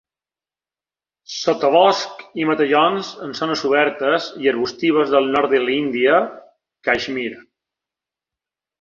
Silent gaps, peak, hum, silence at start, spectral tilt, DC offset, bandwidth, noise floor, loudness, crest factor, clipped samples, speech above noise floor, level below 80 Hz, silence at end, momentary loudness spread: none; -2 dBFS; none; 1.3 s; -4.5 dB/octave; under 0.1%; 7.4 kHz; under -90 dBFS; -18 LUFS; 18 dB; under 0.1%; over 72 dB; -62 dBFS; 1.4 s; 11 LU